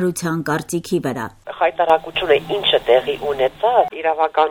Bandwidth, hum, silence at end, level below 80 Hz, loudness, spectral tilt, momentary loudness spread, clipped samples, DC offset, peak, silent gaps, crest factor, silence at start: 19 kHz; none; 0 s; -50 dBFS; -18 LUFS; -4.5 dB/octave; 7 LU; under 0.1%; under 0.1%; -2 dBFS; none; 16 dB; 0 s